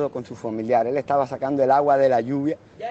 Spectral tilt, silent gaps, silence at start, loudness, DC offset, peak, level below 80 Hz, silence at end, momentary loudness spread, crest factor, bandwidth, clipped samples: -8 dB/octave; none; 0 s; -21 LUFS; under 0.1%; -8 dBFS; -64 dBFS; 0 s; 12 LU; 14 dB; 8 kHz; under 0.1%